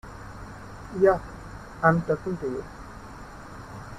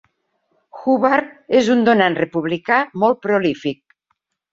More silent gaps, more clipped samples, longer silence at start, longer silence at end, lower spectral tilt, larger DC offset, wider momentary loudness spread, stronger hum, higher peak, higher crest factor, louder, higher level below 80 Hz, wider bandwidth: neither; neither; second, 0.05 s vs 0.75 s; second, 0 s vs 0.8 s; first, -7.5 dB/octave vs -6 dB/octave; neither; first, 21 LU vs 11 LU; neither; second, -6 dBFS vs -2 dBFS; first, 22 dB vs 16 dB; second, -25 LUFS vs -17 LUFS; first, -48 dBFS vs -62 dBFS; first, 13 kHz vs 7.8 kHz